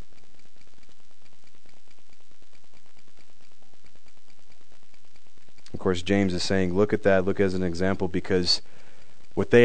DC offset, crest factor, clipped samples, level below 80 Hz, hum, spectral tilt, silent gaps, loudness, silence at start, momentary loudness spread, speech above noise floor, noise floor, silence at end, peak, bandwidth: 4%; 24 dB; under 0.1%; -56 dBFS; none; -5.5 dB/octave; none; -25 LUFS; 5.75 s; 8 LU; 38 dB; -61 dBFS; 0 s; -4 dBFS; 9.4 kHz